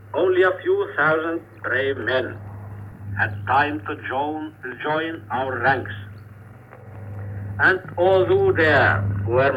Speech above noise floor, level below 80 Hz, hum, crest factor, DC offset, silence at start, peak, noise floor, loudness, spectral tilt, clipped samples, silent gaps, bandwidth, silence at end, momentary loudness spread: 22 dB; -50 dBFS; none; 16 dB; under 0.1%; 0 s; -4 dBFS; -43 dBFS; -21 LUFS; -8 dB/octave; under 0.1%; none; 7.6 kHz; 0 s; 19 LU